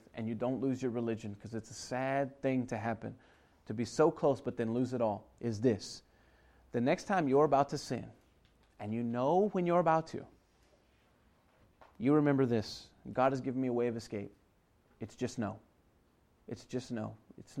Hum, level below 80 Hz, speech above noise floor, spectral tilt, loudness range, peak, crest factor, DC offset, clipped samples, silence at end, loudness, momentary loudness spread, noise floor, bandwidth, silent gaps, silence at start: none; -68 dBFS; 37 dB; -6.5 dB/octave; 5 LU; -16 dBFS; 20 dB; under 0.1%; under 0.1%; 0 s; -34 LUFS; 17 LU; -70 dBFS; 12 kHz; none; 0.15 s